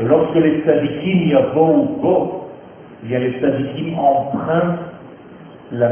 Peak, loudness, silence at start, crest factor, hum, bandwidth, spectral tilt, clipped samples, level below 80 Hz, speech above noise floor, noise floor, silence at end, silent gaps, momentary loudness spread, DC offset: 0 dBFS; -17 LUFS; 0 s; 16 dB; none; 3.4 kHz; -11.5 dB/octave; under 0.1%; -52 dBFS; 23 dB; -39 dBFS; 0 s; none; 13 LU; under 0.1%